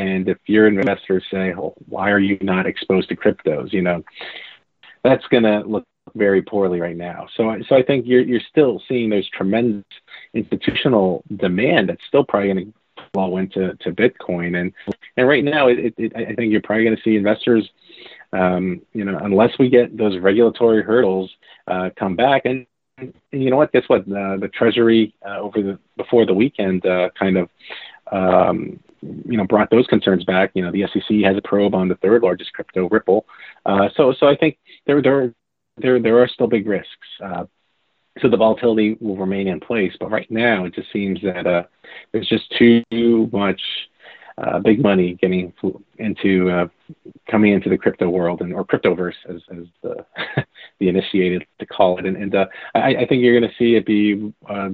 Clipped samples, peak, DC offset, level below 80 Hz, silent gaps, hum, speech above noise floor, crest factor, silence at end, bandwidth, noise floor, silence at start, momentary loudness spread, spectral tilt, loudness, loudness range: under 0.1%; 0 dBFS; under 0.1%; -56 dBFS; none; none; 50 dB; 18 dB; 0 s; 4.6 kHz; -67 dBFS; 0 s; 13 LU; -5 dB/octave; -18 LUFS; 3 LU